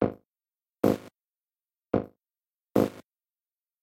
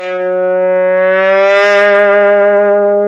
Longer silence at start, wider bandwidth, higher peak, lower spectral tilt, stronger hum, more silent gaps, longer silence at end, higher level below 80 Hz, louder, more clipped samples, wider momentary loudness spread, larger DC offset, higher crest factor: about the same, 0 s vs 0 s; first, 16 kHz vs 7.6 kHz; second, -8 dBFS vs 0 dBFS; first, -7.5 dB/octave vs -5 dB/octave; neither; neither; first, 0.8 s vs 0 s; first, -58 dBFS vs -74 dBFS; second, -29 LUFS vs -9 LUFS; neither; about the same, 5 LU vs 5 LU; neither; first, 24 dB vs 8 dB